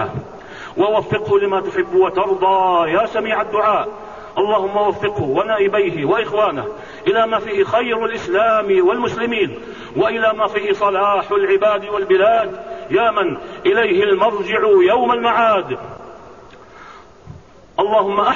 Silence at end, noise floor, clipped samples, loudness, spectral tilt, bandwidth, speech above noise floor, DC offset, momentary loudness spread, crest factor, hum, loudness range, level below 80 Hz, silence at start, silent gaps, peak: 0 s; -40 dBFS; under 0.1%; -17 LUFS; -6 dB/octave; 7.2 kHz; 24 dB; 0.3%; 12 LU; 12 dB; none; 2 LU; -52 dBFS; 0 s; none; -4 dBFS